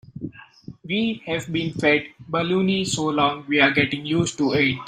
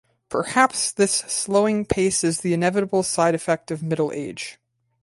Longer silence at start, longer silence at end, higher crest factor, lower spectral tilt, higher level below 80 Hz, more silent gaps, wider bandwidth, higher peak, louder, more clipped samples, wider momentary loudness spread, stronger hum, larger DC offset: second, 0.15 s vs 0.3 s; second, 0 s vs 0.5 s; about the same, 20 dB vs 18 dB; about the same, -4.5 dB/octave vs -4 dB/octave; about the same, -56 dBFS vs -52 dBFS; neither; first, 15 kHz vs 12 kHz; about the same, -2 dBFS vs -4 dBFS; about the same, -21 LUFS vs -21 LUFS; neither; about the same, 10 LU vs 9 LU; neither; neither